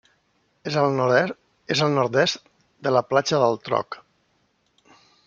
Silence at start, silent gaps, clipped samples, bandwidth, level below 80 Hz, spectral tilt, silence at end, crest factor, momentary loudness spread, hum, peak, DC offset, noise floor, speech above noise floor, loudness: 0.65 s; none; under 0.1%; 7.6 kHz; -68 dBFS; -5 dB/octave; 1.3 s; 20 dB; 15 LU; none; -4 dBFS; under 0.1%; -67 dBFS; 46 dB; -22 LUFS